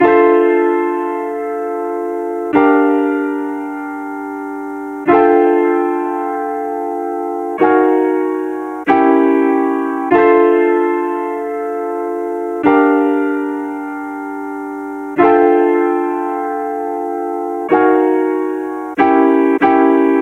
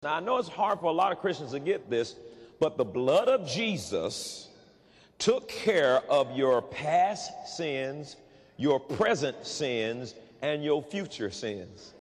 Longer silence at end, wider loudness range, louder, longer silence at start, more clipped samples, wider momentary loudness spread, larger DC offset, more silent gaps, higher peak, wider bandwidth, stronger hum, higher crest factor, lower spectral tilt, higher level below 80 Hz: about the same, 0 s vs 0.1 s; about the same, 4 LU vs 3 LU; first, -15 LUFS vs -29 LUFS; about the same, 0 s vs 0 s; neither; about the same, 13 LU vs 12 LU; neither; neither; first, 0 dBFS vs -14 dBFS; second, 9.6 kHz vs 13 kHz; neither; about the same, 14 dB vs 16 dB; first, -7 dB/octave vs -4.5 dB/octave; first, -58 dBFS vs -68 dBFS